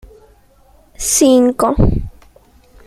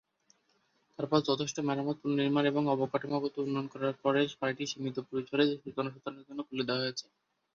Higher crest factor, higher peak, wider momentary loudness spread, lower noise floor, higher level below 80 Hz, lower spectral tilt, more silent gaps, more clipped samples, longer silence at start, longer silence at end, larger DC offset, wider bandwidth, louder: about the same, 16 dB vs 20 dB; first, 0 dBFS vs -14 dBFS; first, 14 LU vs 9 LU; second, -49 dBFS vs -73 dBFS; first, -26 dBFS vs -76 dBFS; about the same, -5 dB/octave vs -5.5 dB/octave; neither; neither; about the same, 1 s vs 1 s; first, 0.75 s vs 0.55 s; neither; first, 16 kHz vs 7.6 kHz; first, -13 LUFS vs -32 LUFS